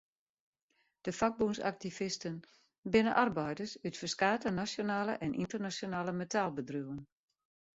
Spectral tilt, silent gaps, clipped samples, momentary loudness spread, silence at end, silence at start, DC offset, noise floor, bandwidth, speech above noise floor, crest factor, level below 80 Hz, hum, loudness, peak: -4 dB/octave; 2.78-2.83 s; under 0.1%; 11 LU; 0.75 s; 1.05 s; under 0.1%; -79 dBFS; 8 kHz; 44 dB; 22 dB; -66 dBFS; none; -35 LUFS; -14 dBFS